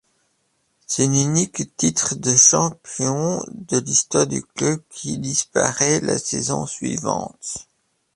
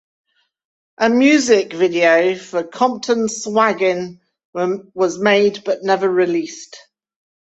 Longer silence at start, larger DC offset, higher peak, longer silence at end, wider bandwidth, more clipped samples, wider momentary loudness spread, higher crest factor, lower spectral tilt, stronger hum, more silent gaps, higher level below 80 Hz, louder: about the same, 0.9 s vs 1 s; neither; about the same, -2 dBFS vs -2 dBFS; second, 0.55 s vs 0.8 s; first, 11.5 kHz vs 8.2 kHz; neither; about the same, 13 LU vs 12 LU; about the same, 20 dB vs 16 dB; about the same, -3.5 dB/octave vs -4 dB/octave; neither; second, none vs 4.45-4.53 s; first, -56 dBFS vs -64 dBFS; second, -19 LUFS vs -16 LUFS